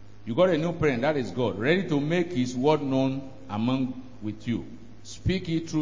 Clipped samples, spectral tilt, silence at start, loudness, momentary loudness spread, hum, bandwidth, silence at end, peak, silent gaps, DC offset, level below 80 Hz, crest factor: under 0.1%; -6.5 dB/octave; 0 s; -27 LUFS; 12 LU; none; 7.6 kHz; 0 s; -8 dBFS; none; 0.7%; -48 dBFS; 18 dB